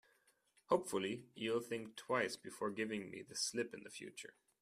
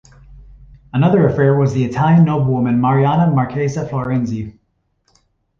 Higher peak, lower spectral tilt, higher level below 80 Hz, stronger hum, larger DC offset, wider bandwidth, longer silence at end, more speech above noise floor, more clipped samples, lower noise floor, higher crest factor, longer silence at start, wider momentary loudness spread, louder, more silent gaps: second, -20 dBFS vs -2 dBFS; second, -3.5 dB/octave vs -9 dB/octave; second, -82 dBFS vs -44 dBFS; neither; neither; first, 15 kHz vs 7.2 kHz; second, 0.3 s vs 1.1 s; second, 34 dB vs 51 dB; neither; first, -76 dBFS vs -65 dBFS; first, 22 dB vs 14 dB; first, 0.7 s vs 0.3 s; about the same, 12 LU vs 10 LU; second, -42 LUFS vs -15 LUFS; neither